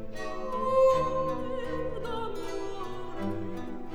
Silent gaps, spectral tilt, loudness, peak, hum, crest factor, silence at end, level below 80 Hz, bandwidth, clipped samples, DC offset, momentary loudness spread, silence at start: none; -6 dB/octave; -31 LUFS; -14 dBFS; none; 16 dB; 0 s; -46 dBFS; 12.5 kHz; under 0.1%; under 0.1%; 14 LU; 0 s